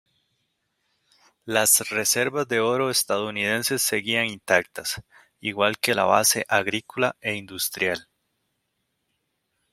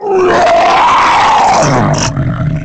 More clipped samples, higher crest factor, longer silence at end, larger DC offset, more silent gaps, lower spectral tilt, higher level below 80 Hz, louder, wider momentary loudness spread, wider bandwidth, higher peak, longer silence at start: neither; first, 24 dB vs 8 dB; first, 1.7 s vs 0 s; neither; neither; second, -2 dB/octave vs -4.5 dB/octave; second, -66 dBFS vs -30 dBFS; second, -22 LUFS vs -8 LUFS; first, 11 LU vs 6 LU; first, 16 kHz vs 9.4 kHz; about the same, -2 dBFS vs 0 dBFS; first, 1.45 s vs 0 s